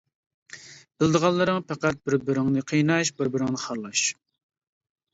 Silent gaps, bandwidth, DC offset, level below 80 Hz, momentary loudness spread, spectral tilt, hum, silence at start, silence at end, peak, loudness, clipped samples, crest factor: none; 8 kHz; under 0.1%; -60 dBFS; 13 LU; -4.5 dB/octave; none; 0.55 s; 1 s; -6 dBFS; -24 LUFS; under 0.1%; 20 dB